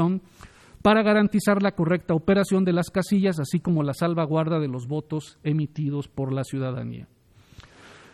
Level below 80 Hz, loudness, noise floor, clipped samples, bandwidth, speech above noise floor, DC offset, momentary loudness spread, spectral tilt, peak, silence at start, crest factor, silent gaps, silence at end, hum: -56 dBFS; -24 LUFS; -51 dBFS; under 0.1%; 14 kHz; 28 dB; under 0.1%; 10 LU; -7 dB/octave; -6 dBFS; 0 s; 18 dB; none; 0.25 s; none